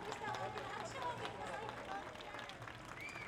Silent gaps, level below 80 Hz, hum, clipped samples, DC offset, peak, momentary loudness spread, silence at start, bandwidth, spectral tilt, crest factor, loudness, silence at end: none; -68 dBFS; none; under 0.1%; under 0.1%; -28 dBFS; 5 LU; 0 s; 19.5 kHz; -4 dB/octave; 18 dB; -46 LUFS; 0 s